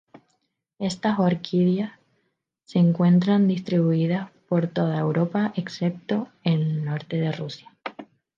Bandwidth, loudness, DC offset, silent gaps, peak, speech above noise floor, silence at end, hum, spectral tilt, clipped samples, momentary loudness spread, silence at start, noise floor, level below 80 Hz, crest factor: 7.6 kHz; -24 LUFS; under 0.1%; none; -8 dBFS; 51 dB; 0.35 s; none; -8 dB/octave; under 0.1%; 12 LU; 0.8 s; -74 dBFS; -68 dBFS; 16 dB